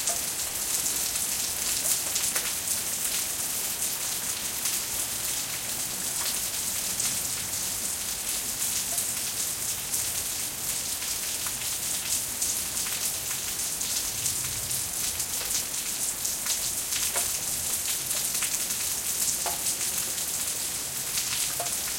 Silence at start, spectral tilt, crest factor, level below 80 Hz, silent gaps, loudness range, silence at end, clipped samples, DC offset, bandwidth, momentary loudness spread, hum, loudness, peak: 0 s; 0.5 dB/octave; 22 dB; -56 dBFS; none; 2 LU; 0 s; under 0.1%; under 0.1%; 17 kHz; 3 LU; none; -26 LUFS; -8 dBFS